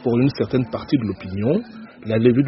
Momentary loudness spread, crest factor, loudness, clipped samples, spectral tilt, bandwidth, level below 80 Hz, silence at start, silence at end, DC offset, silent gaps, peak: 8 LU; 16 dB; -21 LUFS; under 0.1%; -7.5 dB/octave; 6 kHz; -50 dBFS; 0 s; 0 s; under 0.1%; none; -2 dBFS